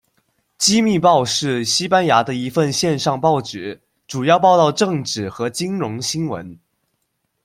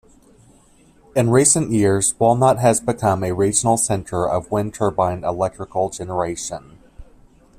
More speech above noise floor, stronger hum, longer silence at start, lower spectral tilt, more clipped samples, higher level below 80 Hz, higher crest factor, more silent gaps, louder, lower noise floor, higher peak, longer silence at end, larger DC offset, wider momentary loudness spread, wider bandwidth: first, 54 dB vs 34 dB; neither; second, 0.6 s vs 1.15 s; about the same, -4 dB/octave vs -5 dB/octave; neither; second, -58 dBFS vs -48 dBFS; about the same, 18 dB vs 20 dB; neither; about the same, -17 LUFS vs -18 LUFS; first, -71 dBFS vs -52 dBFS; about the same, -2 dBFS vs 0 dBFS; first, 0.9 s vs 0.55 s; neither; about the same, 10 LU vs 9 LU; about the same, 16 kHz vs 15 kHz